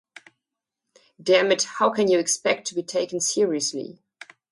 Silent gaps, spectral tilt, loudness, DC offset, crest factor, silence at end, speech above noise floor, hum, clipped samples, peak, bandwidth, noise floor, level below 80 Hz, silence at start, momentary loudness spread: none; -2.5 dB/octave; -22 LUFS; under 0.1%; 18 dB; 0.6 s; 63 dB; none; under 0.1%; -6 dBFS; 11.5 kHz; -85 dBFS; -74 dBFS; 1.25 s; 9 LU